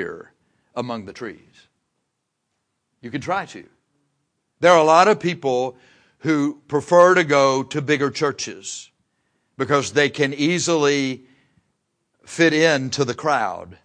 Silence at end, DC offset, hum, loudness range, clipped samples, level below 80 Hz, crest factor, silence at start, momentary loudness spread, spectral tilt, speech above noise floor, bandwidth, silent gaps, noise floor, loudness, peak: 0.1 s; under 0.1%; none; 15 LU; under 0.1%; -66 dBFS; 20 dB; 0 s; 18 LU; -4.5 dB/octave; 57 dB; 10.5 kHz; none; -76 dBFS; -19 LUFS; 0 dBFS